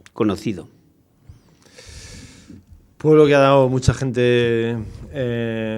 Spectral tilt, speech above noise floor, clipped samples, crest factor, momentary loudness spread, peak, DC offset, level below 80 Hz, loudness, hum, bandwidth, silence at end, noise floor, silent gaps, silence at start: -6.5 dB/octave; 39 dB; under 0.1%; 18 dB; 23 LU; 0 dBFS; under 0.1%; -42 dBFS; -18 LUFS; none; 11.5 kHz; 0 s; -56 dBFS; none; 0.15 s